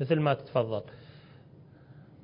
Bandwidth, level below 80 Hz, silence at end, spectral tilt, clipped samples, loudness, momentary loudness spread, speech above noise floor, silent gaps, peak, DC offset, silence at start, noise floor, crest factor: 5.4 kHz; -66 dBFS; 0.25 s; -11 dB/octave; under 0.1%; -30 LUFS; 25 LU; 25 dB; none; -12 dBFS; under 0.1%; 0 s; -54 dBFS; 20 dB